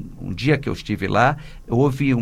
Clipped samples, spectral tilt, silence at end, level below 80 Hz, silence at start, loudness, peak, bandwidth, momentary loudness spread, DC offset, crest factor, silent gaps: under 0.1%; -7 dB/octave; 0 s; -40 dBFS; 0 s; -20 LUFS; -2 dBFS; 14.5 kHz; 9 LU; under 0.1%; 18 dB; none